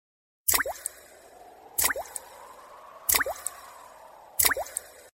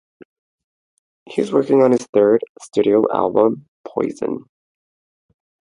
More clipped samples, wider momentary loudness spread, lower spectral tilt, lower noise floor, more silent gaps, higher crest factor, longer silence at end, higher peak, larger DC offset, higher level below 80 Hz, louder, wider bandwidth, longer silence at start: neither; first, 24 LU vs 12 LU; second, 0.5 dB/octave vs -7 dB/octave; second, -51 dBFS vs under -90 dBFS; second, none vs 2.09-2.13 s, 2.49-2.55 s, 3.68-3.84 s; first, 28 dB vs 18 dB; second, 0.25 s vs 1.25 s; second, -4 dBFS vs 0 dBFS; neither; first, -56 dBFS vs -64 dBFS; second, -27 LUFS vs -18 LUFS; first, 16.5 kHz vs 11 kHz; second, 0.45 s vs 1.3 s